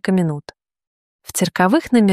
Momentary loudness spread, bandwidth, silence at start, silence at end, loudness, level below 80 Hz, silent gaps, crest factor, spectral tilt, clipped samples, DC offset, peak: 11 LU; 15 kHz; 0.05 s; 0 s; -18 LUFS; -56 dBFS; 0.87-1.19 s; 16 dB; -5.5 dB/octave; under 0.1%; under 0.1%; -2 dBFS